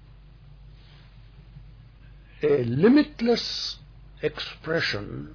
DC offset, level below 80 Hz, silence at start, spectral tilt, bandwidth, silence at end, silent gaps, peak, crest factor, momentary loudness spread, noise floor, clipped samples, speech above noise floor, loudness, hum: under 0.1%; -50 dBFS; 0.65 s; -6 dB/octave; 5.4 kHz; 0 s; none; -8 dBFS; 18 dB; 13 LU; -49 dBFS; under 0.1%; 25 dB; -24 LUFS; none